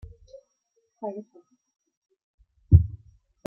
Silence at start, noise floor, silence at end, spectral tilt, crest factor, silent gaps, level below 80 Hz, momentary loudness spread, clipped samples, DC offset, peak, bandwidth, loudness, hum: 1 s; -74 dBFS; 0.55 s; -12.5 dB/octave; 26 dB; 1.97-2.02 s, 2.23-2.38 s; -38 dBFS; 18 LU; under 0.1%; under 0.1%; -2 dBFS; 1 kHz; -24 LUFS; none